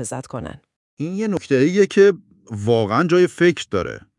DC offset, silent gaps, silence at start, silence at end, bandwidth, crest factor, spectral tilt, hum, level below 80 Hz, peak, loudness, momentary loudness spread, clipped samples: under 0.1%; 0.76-0.97 s; 0 s; 0.2 s; 11.5 kHz; 16 dB; -6 dB/octave; none; -56 dBFS; -2 dBFS; -18 LUFS; 17 LU; under 0.1%